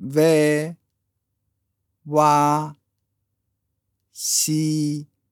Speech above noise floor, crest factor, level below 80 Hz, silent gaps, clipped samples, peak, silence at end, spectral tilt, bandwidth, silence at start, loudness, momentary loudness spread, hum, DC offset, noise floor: 57 dB; 20 dB; -76 dBFS; none; under 0.1%; -4 dBFS; 0.3 s; -4.5 dB/octave; 19.5 kHz; 0 s; -20 LUFS; 13 LU; none; under 0.1%; -76 dBFS